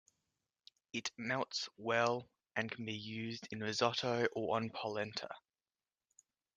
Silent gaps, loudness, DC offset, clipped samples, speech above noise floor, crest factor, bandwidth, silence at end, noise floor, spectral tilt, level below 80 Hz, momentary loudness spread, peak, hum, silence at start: none; -39 LUFS; under 0.1%; under 0.1%; over 51 dB; 22 dB; 10 kHz; 1.15 s; under -90 dBFS; -4 dB/octave; -82 dBFS; 9 LU; -18 dBFS; none; 0.95 s